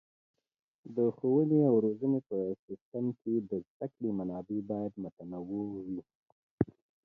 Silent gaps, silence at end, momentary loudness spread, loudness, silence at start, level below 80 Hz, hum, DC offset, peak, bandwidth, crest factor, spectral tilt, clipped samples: 2.59-2.68 s, 2.81-2.92 s, 3.67-3.80 s, 5.13-5.17 s, 6.15-6.26 s, 6.32-6.58 s; 0.4 s; 15 LU; -33 LUFS; 0.85 s; -66 dBFS; none; under 0.1%; -12 dBFS; 2.5 kHz; 22 dB; -13 dB/octave; under 0.1%